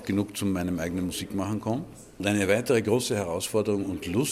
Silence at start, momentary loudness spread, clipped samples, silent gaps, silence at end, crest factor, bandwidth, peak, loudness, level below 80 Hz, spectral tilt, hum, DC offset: 0 s; 7 LU; under 0.1%; none; 0 s; 18 dB; 16 kHz; -8 dBFS; -27 LUFS; -58 dBFS; -5 dB/octave; none; under 0.1%